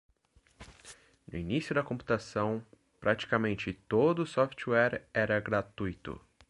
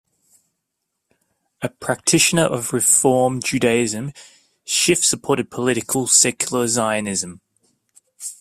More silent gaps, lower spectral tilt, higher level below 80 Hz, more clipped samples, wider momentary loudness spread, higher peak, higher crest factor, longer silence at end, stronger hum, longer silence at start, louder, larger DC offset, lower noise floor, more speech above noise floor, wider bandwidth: neither; first, -6.5 dB/octave vs -2.5 dB/octave; about the same, -58 dBFS vs -58 dBFS; neither; about the same, 16 LU vs 15 LU; second, -12 dBFS vs -2 dBFS; about the same, 22 dB vs 20 dB; first, 0.3 s vs 0.05 s; neither; second, 0.6 s vs 1.6 s; second, -31 LUFS vs -17 LUFS; neither; second, -67 dBFS vs -77 dBFS; second, 36 dB vs 59 dB; second, 11.5 kHz vs 16 kHz